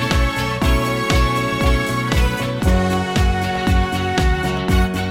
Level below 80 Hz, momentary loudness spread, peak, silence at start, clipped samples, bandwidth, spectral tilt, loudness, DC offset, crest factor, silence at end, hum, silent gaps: -22 dBFS; 2 LU; -2 dBFS; 0 s; under 0.1%; 16.5 kHz; -5.5 dB/octave; -18 LUFS; 0.1%; 14 dB; 0 s; none; none